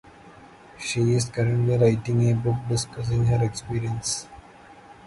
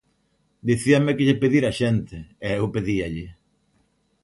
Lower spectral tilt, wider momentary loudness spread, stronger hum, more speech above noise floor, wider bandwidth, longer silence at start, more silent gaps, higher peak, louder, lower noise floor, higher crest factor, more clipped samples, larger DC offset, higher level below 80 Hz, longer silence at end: about the same, -6 dB/octave vs -6.5 dB/octave; second, 9 LU vs 14 LU; neither; second, 25 dB vs 46 dB; about the same, 11.5 kHz vs 11.5 kHz; second, 0.25 s vs 0.65 s; neither; second, -8 dBFS vs -4 dBFS; about the same, -24 LUFS vs -22 LUFS; second, -48 dBFS vs -67 dBFS; about the same, 16 dB vs 18 dB; neither; neither; about the same, -48 dBFS vs -48 dBFS; second, 0.15 s vs 0.9 s